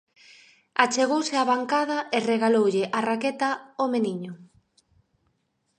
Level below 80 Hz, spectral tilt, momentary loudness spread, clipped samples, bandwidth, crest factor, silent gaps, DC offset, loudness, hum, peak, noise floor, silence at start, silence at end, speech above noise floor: -76 dBFS; -4 dB/octave; 7 LU; under 0.1%; 10 kHz; 24 dB; none; under 0.1%; -24 LUFS; none; -2 dBFS; -73 dBFS; 0.8 s; 1.35 s; 49 dB